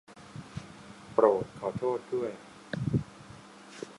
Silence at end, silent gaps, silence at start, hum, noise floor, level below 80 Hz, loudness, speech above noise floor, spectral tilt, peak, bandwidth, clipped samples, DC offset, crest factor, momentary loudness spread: 0 s; none; 0.1 s; none; -50 dBFS; -58 dBFS; -31 LUFS; 22 dB; -7.5 dB/octave; -10 dBFS; 11.5 kHz; under 0.1%; under 0.1%; 24 dB; 23 LU